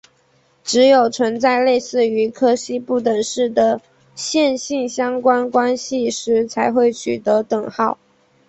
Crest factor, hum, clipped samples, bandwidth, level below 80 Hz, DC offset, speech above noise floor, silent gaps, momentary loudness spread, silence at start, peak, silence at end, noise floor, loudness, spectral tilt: 16 dB; none; under 0.1%; 8.2 kHz; -62 dBFS; under 0.1%; 41 dB; none; 7 LU; 0.65 s; -2 dBFS; 0.55 s; -58 dBFS; -17 LUFS; -3.5 dB/octave